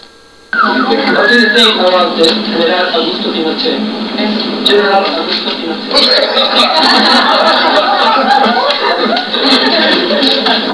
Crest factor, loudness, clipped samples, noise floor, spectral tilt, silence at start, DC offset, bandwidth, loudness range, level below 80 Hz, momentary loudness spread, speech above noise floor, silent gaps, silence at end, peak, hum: 10 dB; -9 LUFS; 0.3%; -39 dBFS; -3.5 dB/octave; 0.55 s; 0.3%; 11 kHz; 4 LU; -52 dBFS; 7 LU; 29 dB; none; 0 s; 0 dBFS; none